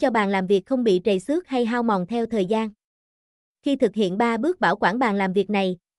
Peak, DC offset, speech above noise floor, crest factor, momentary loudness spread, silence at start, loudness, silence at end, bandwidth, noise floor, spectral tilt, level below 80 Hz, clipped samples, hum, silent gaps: -8 dBFS; under 0.1%; over 68 dB; 14 dB; 4 LU; 0 s; -22 LUFS; 0.25 s; 12 kHz; under -90 dBFS; -6.5 dB/octave; -60 dBFS; under 0.1%; none; 2.84-3.55 s